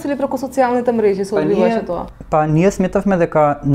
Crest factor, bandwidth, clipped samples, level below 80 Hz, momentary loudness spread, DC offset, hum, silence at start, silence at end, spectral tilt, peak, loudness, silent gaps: 14 dB; 15 kHz; under 0.1%; -40 dBFS; 6 LU; under 0.1%; none; 0 s; 0 s; -7.5 dB/octave; 0 dBFS; -16 LUFS; none